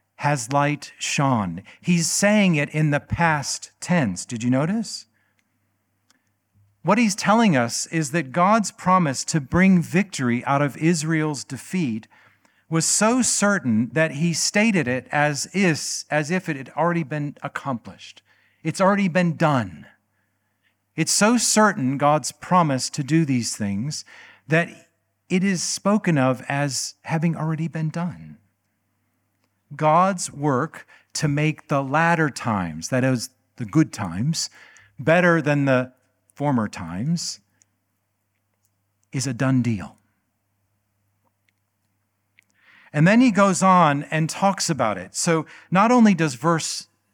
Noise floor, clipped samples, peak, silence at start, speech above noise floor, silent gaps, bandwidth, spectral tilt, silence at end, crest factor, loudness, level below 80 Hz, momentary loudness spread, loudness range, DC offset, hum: -73 dBFS; under 0.1%; -2 dBFS; 0.2 s; 52 dB; none; 17.5 kHz; -5 dB/octave; 0.3 s; 20 dB; -21 LUFS; -58 dBFS; 12 LU; 8 LU; under 0.1%; none